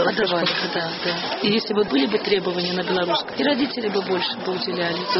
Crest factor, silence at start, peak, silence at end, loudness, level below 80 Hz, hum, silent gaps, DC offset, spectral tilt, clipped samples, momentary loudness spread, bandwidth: 16 dB; 0 s; -6 dBFS; 0 s; -22 LUFS; -62 dBFS; none; none; under 0.1%; -2.5 dB/octave; under 0.1%; 4 LU; 6 kHz